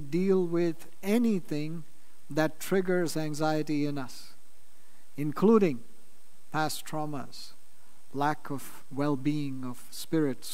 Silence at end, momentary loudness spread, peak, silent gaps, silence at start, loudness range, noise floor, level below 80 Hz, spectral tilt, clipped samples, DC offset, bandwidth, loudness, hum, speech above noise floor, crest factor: 0 s; 15 LU; -10 dBFS; none; 0 s; 5 LU; -63 dBFS; -72 dBFS; -6 dB/octave; under 0.1%; 2%; 16 kHz; -30 LUFS; none; 33 dB; 20 dB